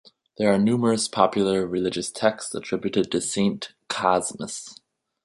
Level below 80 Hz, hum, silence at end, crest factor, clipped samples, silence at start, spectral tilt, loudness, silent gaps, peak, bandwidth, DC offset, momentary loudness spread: -60 dBFS; none; 0.5 s; 22 dB; under 0.1%; 0.4 s; -4.5 dB/octave; -24 LUFS; none; -2 dBFS; 11.5 kHz; under 0.1%; 12 LU